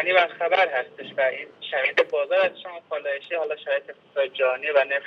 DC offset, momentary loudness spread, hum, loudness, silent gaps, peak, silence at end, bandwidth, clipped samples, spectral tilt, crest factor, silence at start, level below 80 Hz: under 0.1%; 11 LU; none; -24 LUFS; none; -4 dBFS; 0 s; 6.4 kHz; under 0.1%; -3.5 dB/octave; 20 dB; 0 s; under -90 dBFS